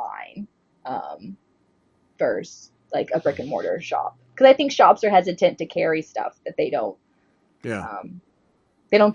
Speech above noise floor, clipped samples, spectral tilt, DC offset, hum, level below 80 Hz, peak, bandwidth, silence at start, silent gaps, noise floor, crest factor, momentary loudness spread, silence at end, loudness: 43 dB; under 0.1%; -5 dB/octave; under 0.1%; none; -68 dBFS; -2 dBFS; 9 kHz; 0 s; none; -64 dBFS; 22 dB; 22 LU; 0 s; -21 LUFS